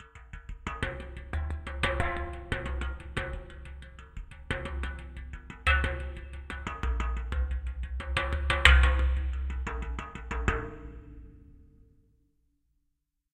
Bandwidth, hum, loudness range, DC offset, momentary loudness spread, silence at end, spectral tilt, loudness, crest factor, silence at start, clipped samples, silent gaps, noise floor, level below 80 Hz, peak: 9.8 kHz; none; 10 LU; under 0.1%; 20 LU; 1.7 s; -5 dB/octave; -31 LUFS; 30 dB; 0 s; under 0.1%; none; -79 dBFS; -34 dBFS; 0 dBFS